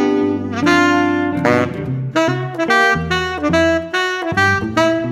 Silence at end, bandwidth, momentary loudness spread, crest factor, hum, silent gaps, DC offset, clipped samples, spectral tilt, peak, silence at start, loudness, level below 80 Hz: 0 s; 14.5 kHz; 6 LU; 16 dB; none; none; under 0.1%; under 0.1%; -5.5 dB/octave; 0 dBFS; 0 s; -16 LUFS; -42 dBFS